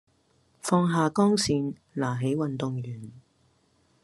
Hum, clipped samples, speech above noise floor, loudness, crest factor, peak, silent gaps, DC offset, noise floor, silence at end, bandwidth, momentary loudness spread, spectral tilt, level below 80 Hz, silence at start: none; under 0.1%; 40 dB; -27 LUFS; 20 dB; -8 dBFS; none; under 0.1%; -66 dBFS; 0.85 s; 12.5 kHz; 15 LU; -5.5 dB/octave; -64 dBFS; 0.65 s